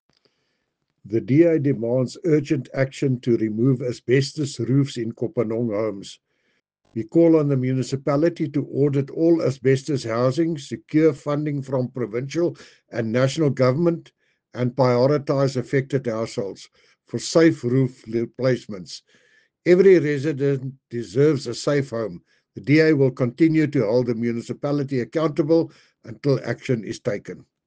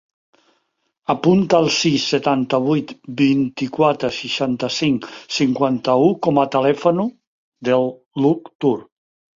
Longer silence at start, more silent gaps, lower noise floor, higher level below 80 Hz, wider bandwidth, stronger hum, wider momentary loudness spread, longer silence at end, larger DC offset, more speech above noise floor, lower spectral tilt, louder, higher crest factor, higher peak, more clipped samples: about the same, 1.05 s vs 1.1 s; second, none vs 7.27-7.52 s, 8.06-8.11 s, 8.55-8.59 s; first, -75 dBFS vs -70 dBFS; second, -64 dBFS vs -58 dBFS; first, 9.4 kHz vs 7.6 kHz; neither; first, 11 LU vs 8 LU; second, 0.25 s vs 0.55 s; neither; about the same, 54 dB vs 52 dB; first, -7 dB/octave vs -5.5 dB/octave; second, -21 LUFS vs -18 LUFS; about the same, 18 dB vs 18 dB; about the same, -4 dBFS vs -2 dBFS; neither